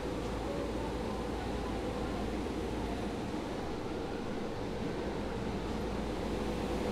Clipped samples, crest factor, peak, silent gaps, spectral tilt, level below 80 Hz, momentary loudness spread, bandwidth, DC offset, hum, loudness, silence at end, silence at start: under 0.1%; 14 dB; -24 dBFS; none; -6 dB/octave; -44 dBFS; 2 LU; 15 kHz; under 0.1%; none; -37 LUFS; 0 s; 0 s